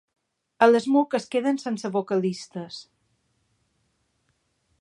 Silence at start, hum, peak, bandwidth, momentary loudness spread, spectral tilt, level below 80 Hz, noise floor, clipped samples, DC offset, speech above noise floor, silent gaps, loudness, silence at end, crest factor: 0.6 s; none; -4 dBFS; 11 kHz; 17 LU; -5.5 dB/octave; -78 dBFS; -72 dBFS; under 0.1%; under 0.1%; 48 dB; none; -23 LUFS; 2 s; 22 dB